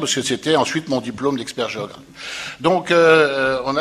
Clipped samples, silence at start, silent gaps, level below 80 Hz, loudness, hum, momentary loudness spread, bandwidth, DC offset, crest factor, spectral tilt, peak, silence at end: under 0.1%; 0 s; none; -56 dBFS; -18 LUFS; none; 16 LU; 14 kHz; under 0.1%; 18 dB; -3.5 dB/octave; 0 dBFS; 0 s